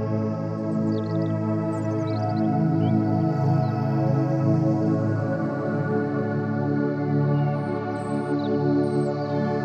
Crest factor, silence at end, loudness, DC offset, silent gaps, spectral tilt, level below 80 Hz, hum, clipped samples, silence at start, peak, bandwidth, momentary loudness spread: 12 dB; 0 s; -24 LUFS; under 0.1%; none; -9.5 dB/octave; -64 dBFS; none; under 0.1%; 0 s; -10 dBFS; 9 kHz; 4 LU